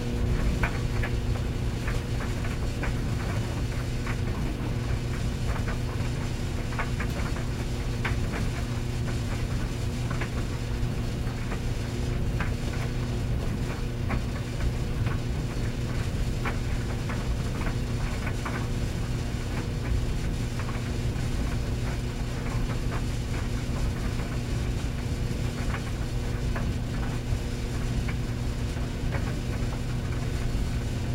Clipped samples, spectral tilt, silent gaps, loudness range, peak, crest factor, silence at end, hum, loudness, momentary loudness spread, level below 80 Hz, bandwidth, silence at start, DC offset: under 0.1%; -6 dB/octave; none; 1 LU; -10 dBFS; 18 dB; 0 s; none; -31 LUFS; 2 LU; -32 dBFS; 16 kHz; 0 s; under 0.1%